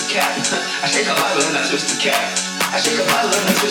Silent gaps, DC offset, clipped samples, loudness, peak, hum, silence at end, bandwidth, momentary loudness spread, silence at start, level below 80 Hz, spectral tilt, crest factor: none; under 0.1%; under 0.1%; -17 LUFS; -2 dBFS; none; 0 s; 19 kHz; 3 LU; 0 s; -62 dBFS; -1.5 dB/octave; 16 dB